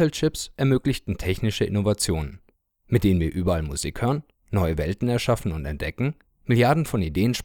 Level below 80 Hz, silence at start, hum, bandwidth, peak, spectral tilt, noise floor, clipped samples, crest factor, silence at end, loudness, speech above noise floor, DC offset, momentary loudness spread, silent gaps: -38 dBFS; 0 s; none; 18.5 kHz; -6 dBFS; -6 dB/octave; -61 dBFS; under 0.1%; 18 dB; 0 s; -24 LUFS; 38 dB; under 0.1%; 8 LU; none